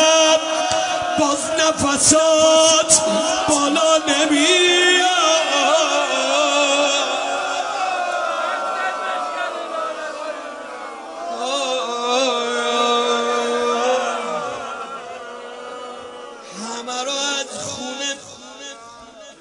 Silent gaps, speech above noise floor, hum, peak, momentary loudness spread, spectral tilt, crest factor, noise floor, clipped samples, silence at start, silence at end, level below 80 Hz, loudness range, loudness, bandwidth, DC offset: none; 26 dB; none; 0 dBFS; 19 LU; -1 dB/octave; 18 dB; -40 dBFS; under 0.1%; 0 s; 0.1 s; -58 dBFS; 12 LU; -17 LUFS; 11 kHz; under 0.1%